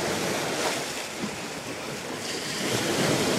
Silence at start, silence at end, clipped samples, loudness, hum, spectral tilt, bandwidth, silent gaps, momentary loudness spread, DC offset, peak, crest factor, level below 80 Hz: 0 s; 0 s; under 0.1%; -28 LUFS; none; -3 dB/octave; 16 kHz; none; 9 LU; under 0.1%; -12 dBFS; 16 dB; -60 dBFS